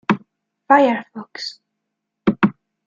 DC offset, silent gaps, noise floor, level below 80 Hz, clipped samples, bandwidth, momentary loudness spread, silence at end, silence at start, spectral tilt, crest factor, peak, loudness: under 0.1%; none; -78 dBFS; -58 dBFS; under 0.1%; 7.6 kHz; 16 LU; 0.35 s; 0.1 s; -6.5 dB/octave; 20 dB; -2 dBFS; -19 LUFS